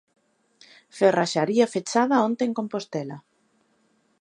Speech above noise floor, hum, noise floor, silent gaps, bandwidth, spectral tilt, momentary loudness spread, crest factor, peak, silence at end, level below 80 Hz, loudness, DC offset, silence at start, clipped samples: 44 dB; none; -66 dBFS; none; 11 kHz; -5 dB/octave; 15 LU; 20 dB; -6 dBFS; 1 s; -78 dBFS; -23 LUFS; under 0.1%; 0.95 s; under 0.1%